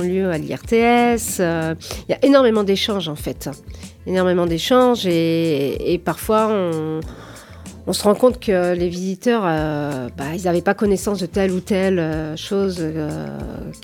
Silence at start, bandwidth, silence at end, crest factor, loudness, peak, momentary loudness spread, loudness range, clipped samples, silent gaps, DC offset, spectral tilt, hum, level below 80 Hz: 0 s; 19 kHz; 0.05 s; 18 dB; -19 LUFS; -2 dBFS; 14 LU; 3 LU; under 0.1%; none; under 0.1%; -5.5 dB/octave; none; -42 dBFS